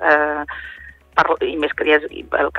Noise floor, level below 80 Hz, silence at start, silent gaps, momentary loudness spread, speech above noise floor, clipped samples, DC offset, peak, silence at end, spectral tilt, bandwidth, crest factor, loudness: -40 dBFS; -46 dBFS; 0 s; none; 16 LU; 21 dB; under 0.1%; under 0.1%; -2 dBFS; 0 s; -5 dB/octave; 6.6 kHz; 18 dB; -18 LUFS